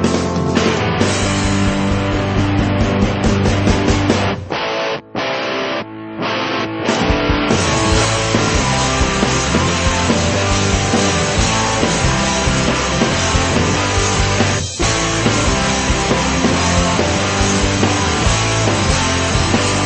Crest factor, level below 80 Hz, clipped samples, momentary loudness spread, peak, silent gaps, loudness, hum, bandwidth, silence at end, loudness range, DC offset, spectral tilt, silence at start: 16 dB; -26 dBFS; under 0.1%; 4 LU; 0 dBFS; none; -15 LUFS; none; 8.8 kHz; 0 s; 3 LU; 0.3%; -4 dB/octave; 0 s